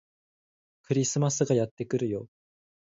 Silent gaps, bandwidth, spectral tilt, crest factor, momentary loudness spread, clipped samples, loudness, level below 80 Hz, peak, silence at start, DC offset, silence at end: 1.71-1.77 s; 8 kHz; -5.5 dB/octave; 18 dB; 6 LU; under 0.1%; -28 LUFS; -66 dBFS; -12 dBFS; 0.9 s; under 0.1%; 0.6 s